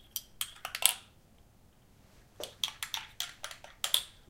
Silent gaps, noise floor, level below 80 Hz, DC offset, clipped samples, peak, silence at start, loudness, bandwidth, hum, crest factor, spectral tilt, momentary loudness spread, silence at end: none; -62 dBFS; -64 dBFS; under 0.1%; under 0.1%; 0 dBFS; 0 s; -34 LUFS; 17 kHz; none; 38 dB; 1.5 dB/octave; 17 LU; 0.2 s